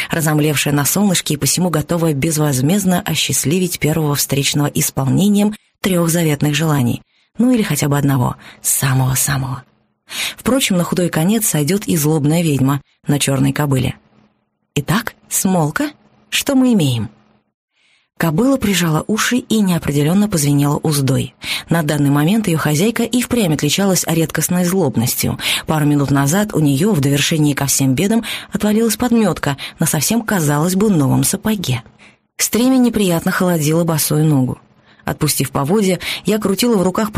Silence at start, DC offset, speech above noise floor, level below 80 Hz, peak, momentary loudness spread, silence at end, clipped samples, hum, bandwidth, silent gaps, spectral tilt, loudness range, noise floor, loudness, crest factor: 0 s; under 0.1%; 48 dB; -44 dBFS; -2 dBFS; 6 LU; 0 s; under 0.1%; none; 15.5 kHz; 17.54-17.68 s; -4.5 dB/octave; 3 LU; -63 dBFS; -15 LUFS; 14 dB